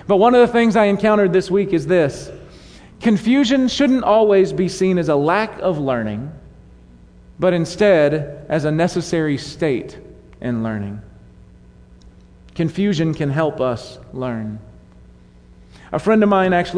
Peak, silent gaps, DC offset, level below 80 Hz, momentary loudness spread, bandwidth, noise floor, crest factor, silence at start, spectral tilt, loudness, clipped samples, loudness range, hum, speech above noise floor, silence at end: -2 dBFS; none; under 0.1%; -46 dBFS; 15 LU; 10.5 kHz; -45 dBFS; 16 dB; 0.05 s; -6.5 dB/octave; -17 LUFS; under 0.1%; 8 LU; none; 29 dB; 0 s